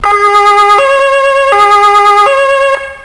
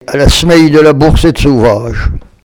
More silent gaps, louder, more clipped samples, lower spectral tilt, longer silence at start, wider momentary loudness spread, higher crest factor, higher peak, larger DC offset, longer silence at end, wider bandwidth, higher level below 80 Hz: neither; about the same, -6 LUFS vs -7 LUFS; second, 0.9% vs 2%; second, -1.5 dB/octave vs -5.5 dB/octave; about the same, 0 s vs 0.1 s; second, 3 LU vs 11 LU; about the same, 6 dB vs 8 dB; about the same, 0 dBFS vs 0 dBFS; neither; second, 0 s vs 0.25 s; second, 11 kHz vs 18.5 kHz; second, -40 dBFS vs -16 dBFS